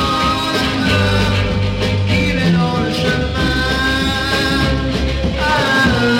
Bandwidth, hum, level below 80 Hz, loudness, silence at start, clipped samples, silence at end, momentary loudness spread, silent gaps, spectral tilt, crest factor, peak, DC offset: 16.5 kHz; none; -26 dBFS; -15 LUFS; 0 s; under 0.1%; 0 s; 4 LU; none; -5.5 dB/octave; 14 dB; -2 dBFS; under 0.1%